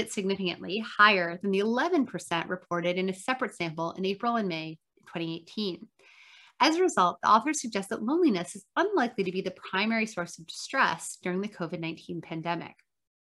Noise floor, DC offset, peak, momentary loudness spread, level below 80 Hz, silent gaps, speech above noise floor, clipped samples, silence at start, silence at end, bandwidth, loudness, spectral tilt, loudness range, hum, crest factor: -56 dBFS; under 0.1%; -6 dBFS; 13 LU; -76 dBFS; none; 27 dB; under 0.1%; 0 s; 0.6 s; 12.5 kHz; -28 LUFS; -4 dB/octave; 6 LU; none; 22 dB